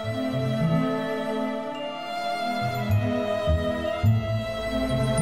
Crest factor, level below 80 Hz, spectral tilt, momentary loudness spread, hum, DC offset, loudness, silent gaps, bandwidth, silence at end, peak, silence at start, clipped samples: 14 dB; -40 dBFS; -6.5 dB/octave; 6 LU; none; 0.3%; -26 LUFS; none; 15 kHz; 0 s; -10 dBFS; 0 s; under 0.1%